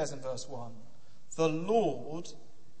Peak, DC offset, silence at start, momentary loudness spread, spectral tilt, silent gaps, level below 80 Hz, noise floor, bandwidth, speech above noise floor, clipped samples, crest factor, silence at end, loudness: -14 dBFS; 1%; 0 s; 17 LU; -5.5 dB/octave; none; -68 dBFS; -54 dBFS; 8.8 kHz; 21 dB; under 0.1%; 20 dB; 0.4 s; -33 LUFS